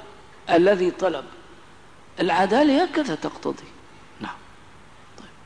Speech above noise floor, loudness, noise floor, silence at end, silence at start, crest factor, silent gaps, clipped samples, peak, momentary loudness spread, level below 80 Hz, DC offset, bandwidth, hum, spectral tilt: 29 dB; -21 LUFS; -50 dBFS; 0.2 s; 0 s; 16 dB; none; under 0.1%; -8 dBFS; 20 LU; -60 dBFS; 0.3%; 10.5 kHz; 50 Hz at -60 dBFS; -5.5 dB/octave